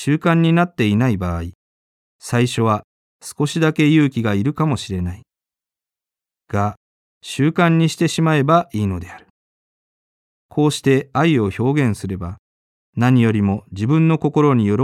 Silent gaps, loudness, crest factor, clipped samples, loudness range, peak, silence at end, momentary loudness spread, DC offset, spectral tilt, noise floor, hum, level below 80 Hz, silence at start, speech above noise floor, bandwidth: 1.55-2.19 s, 2.84-3.19 s, 6.77-7.21 s, 9.30-10.49 s, 12.39-12.93 s; -18 LUFS; 18 dB; under 0.1%; 3 LU; 0 dBFS; 0 s; 14 LU; under 0.1%; -6.5 dB/octave; -89 dBFS; none; -48 dBFS; 0 s; 72 dB; 13.5 kHz